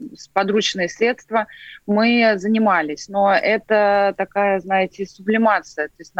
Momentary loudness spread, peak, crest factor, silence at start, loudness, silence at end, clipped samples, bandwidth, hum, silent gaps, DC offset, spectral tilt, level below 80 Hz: 9 LU; 0 dBFS; 18 dB; 0 s; -18 LUFS; 0 s; under 0.1%; 8 kHz; none; none; under 0.1%; -4.5 dB/octave; -60 dBFS